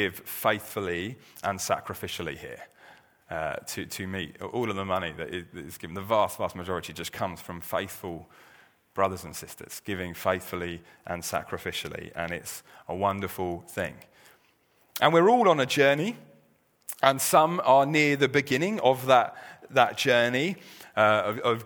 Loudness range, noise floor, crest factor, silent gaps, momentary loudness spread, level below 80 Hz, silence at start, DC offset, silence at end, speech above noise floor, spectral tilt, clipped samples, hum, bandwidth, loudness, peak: 11 LU; -65 dBFS; 24 dB; none; 18 LU; -62 dBFS; 0 s; under 0.1%; 0 s; 38 dB; -4 dB/octave; under 0.1%; none; over 20 kHz; -27 LUFS; -2 dBFS